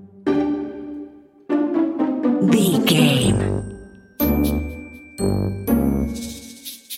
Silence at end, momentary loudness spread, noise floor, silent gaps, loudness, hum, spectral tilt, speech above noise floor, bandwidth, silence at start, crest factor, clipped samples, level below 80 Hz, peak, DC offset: 0 s; 19 LU; -40 dBFS; none; -20 LUFS; none; -5.5 dB/octave; 23 dB; 16.5 kHz; 0 s; 18 dB; under 0.1%; -36 dBFS; -4 dBFS; under 0.1%